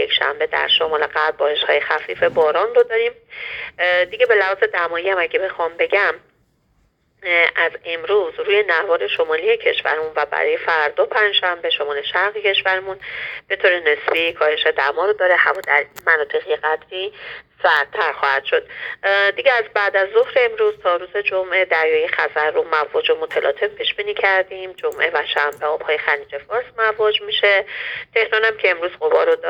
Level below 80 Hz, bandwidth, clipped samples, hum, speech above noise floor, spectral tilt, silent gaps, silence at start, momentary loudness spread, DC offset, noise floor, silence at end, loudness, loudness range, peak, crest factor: -62 dBFS; 16 kHz; under 0.1%; none; 43 dB; -3 dB/octave; none; 0 s; 8 LU; under 0.1%; -62 dBFS; 0 s; -18 LUFS; 2 LU; 0 dBFS; 18 dB